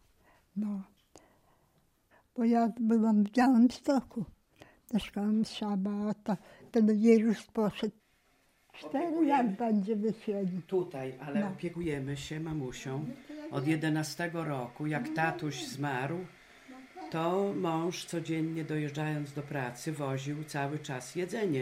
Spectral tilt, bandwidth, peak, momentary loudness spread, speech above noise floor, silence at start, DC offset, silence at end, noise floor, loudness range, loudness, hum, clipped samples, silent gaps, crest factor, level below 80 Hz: -6.5 dB/octave; 14.5 kHz; -12 dBFS; 13 LU; 39 dB; 0.55 s; under 0.1%; 0 s; -70 dBFS; 6 LU; -32 LUFS; none; under 0.1%; none; 20 dB; -66 dBFS